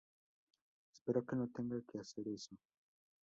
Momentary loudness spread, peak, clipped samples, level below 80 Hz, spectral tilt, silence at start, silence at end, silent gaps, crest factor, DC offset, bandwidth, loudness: 12 LU; -24 dBFS; under 0.1%; -80 dBFS; -7 dB/octave; 0.95 s; 0.65 s; 1.01-1.06 s; 22 dB; under 0.1%; 7.6 kHz; -43 LUFS